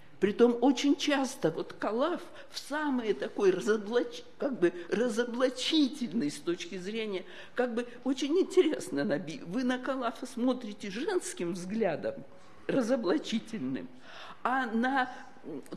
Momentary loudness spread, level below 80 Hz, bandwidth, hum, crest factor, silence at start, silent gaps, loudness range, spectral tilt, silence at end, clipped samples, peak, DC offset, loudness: 12 LU; -74 dBFS; 13 kHz; none; 18 dB; 0.2 s; none; 4 LU; -4.5 dB/octave; 0 s; under 0.1%; -12 dBFS; 0.4%; -31 LUFS